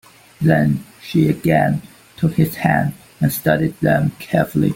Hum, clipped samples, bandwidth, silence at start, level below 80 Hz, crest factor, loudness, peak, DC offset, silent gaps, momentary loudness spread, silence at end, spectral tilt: none; under 0.1%; 17 kHz; 0.4 s; -48 dBFS; 16 dB; -18 LUFS; -2 dBFS; under 0.1%; none; 6 LU; 0 s; -7 dB/octave